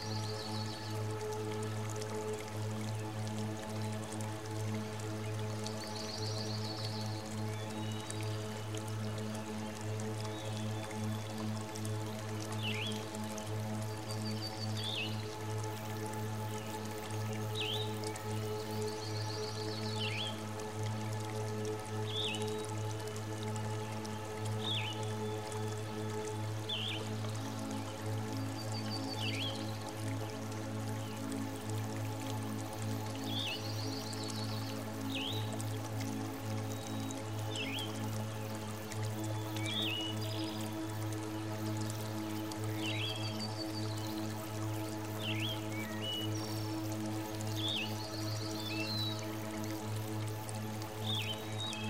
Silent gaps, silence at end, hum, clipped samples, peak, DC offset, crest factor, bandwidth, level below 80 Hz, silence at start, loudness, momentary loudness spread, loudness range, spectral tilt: none; 0 s; none; under 0.1%; -20 dBFS; 0.2%; 18 dB; 16 kHz; -64 dBFS; 0 s; -39 LUFS; 5 LU; 2 LU; -4.5 dB/octave